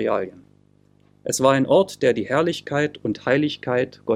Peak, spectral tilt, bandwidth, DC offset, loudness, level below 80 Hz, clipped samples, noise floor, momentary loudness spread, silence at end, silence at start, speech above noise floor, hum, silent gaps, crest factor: -2 dBFS; -5 dB/octave; 16 kHz; under 0.1%; -21 LUFS; -62 dBFS; under 0.1%; -57 dBFS; 9 LU; 0 s; 0 s; 36 dB; 50 Hz at -45 dBFS; none; 18 dB